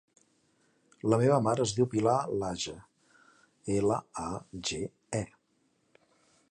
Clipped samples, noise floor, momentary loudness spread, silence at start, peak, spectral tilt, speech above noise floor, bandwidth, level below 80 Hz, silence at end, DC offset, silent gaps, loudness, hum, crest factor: under 0.1%; -73 dBFS; 13 LU; 1.05 s; -10 dBFS; -5.5 dB/octave; 44 dB; 11 kHz; -60 dBFS; 1.25 s; under 0.1%; none; -30 LUFS; none; 22 dB